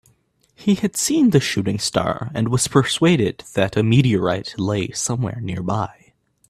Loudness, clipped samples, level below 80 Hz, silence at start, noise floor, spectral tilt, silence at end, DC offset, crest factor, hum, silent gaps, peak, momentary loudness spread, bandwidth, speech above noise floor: -19 LUFS; under 0.1%; -50 dBFS; 0.6 s; -61 dBFS; -5 dB/octave; 0.6 s; under 0.1%; 18 dB; none; none; -2 dBFS; 8 LU; 14.5 kHz; 42 dB